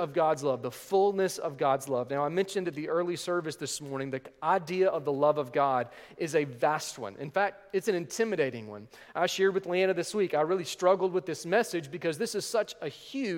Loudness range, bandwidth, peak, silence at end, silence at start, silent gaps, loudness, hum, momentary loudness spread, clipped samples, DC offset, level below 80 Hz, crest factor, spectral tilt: 3 LU; 17 kHz; -12 dBFS; 0 s; 0 s; none; -30 LUFS; none; 9 LU; under 0.1%; under 0.1%; -74 dBFS; 18 dB; -4.5 dB/octave